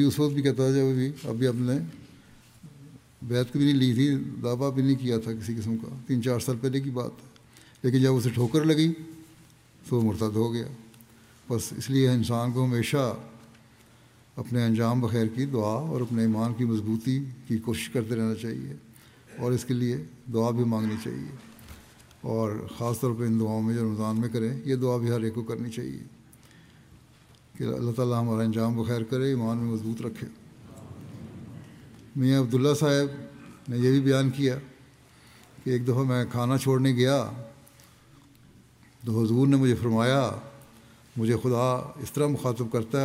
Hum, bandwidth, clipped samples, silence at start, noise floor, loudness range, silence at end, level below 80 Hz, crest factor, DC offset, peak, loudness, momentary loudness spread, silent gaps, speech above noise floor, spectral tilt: none; 16 kHz; under 0.1%; 0 s; -56 dBFS; 4 LU; 0 s; -64 dBFS; 18 dB; under 0.1%; -10 dBFS; -27 LUFS; 17 LU; none; 30 dB; -7 dB/octave